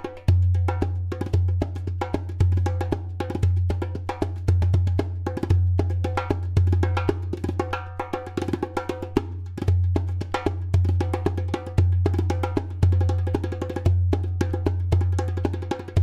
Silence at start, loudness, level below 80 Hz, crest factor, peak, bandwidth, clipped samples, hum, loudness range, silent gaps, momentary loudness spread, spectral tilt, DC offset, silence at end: 0 s; -25 LUFS; -36 dBFS; 18 dB; -6 dBFS; 8 kHz; under 0.1%; none; 3 LU; none; 8 LU; -8 dB/octave; under 0.1%; 0 s